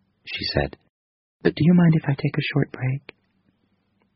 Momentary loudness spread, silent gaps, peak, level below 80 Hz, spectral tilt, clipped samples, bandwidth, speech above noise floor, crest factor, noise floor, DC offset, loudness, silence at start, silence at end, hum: 13 LU; 0.90-1.40 s; -4 dBFS; -46 dBFS; -6 dB/octave; under 0.1%; 5.8 kHz; 47 dB; 20 dB; -68 dBFS; under 0.1%; -22 LUFS; 0.25 s; 1.15 s; none